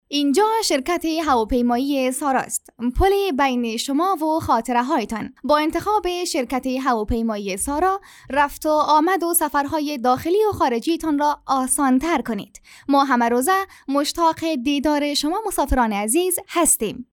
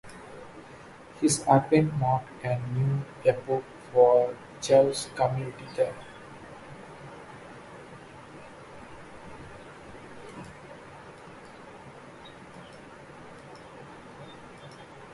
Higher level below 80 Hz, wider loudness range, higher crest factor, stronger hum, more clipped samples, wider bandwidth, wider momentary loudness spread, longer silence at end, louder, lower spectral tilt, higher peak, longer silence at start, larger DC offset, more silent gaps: first, -38 dBFS vs -60 dBFS; second, 2 LU vs 21 LU; second, 14 dB vs 22 dB; neither; neither; first, 19.5 kHz vs 11.5 kHz; second, 6 LU vs 25 LU; about the same, 0.15 s vs 0.05 s; first, -20 LUFS vs -26 LUFS; second, -3 dB/octave vs -5.5 dB/octave; about the same, -6 dBFS vs -8 dBFS; about the same, 0.1 s vs 0.05 s; neither; neither